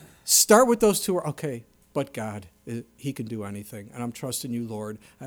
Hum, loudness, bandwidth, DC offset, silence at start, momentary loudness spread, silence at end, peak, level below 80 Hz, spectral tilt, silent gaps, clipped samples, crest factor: none; -24 LUFS; over 20 kHz; under 0.1%; 0 s; 20 LU; 0 s; -4 dBFS; -60 dBFS; -3.5 dB/octave; none; under 0.1%; 22 dB